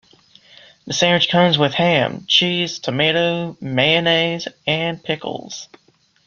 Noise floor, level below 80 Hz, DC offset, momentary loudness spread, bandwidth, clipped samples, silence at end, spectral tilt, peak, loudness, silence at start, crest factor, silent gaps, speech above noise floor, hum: -50 dBFS; -58 dBFS; under 0.1%; 11 LU; 7.4 kHz; under 0.1%; 0.6 s; -4 dB/octave; -2 dBFS; -17 LUFS; 0.85 s; 18 dB; none; 32 dB; none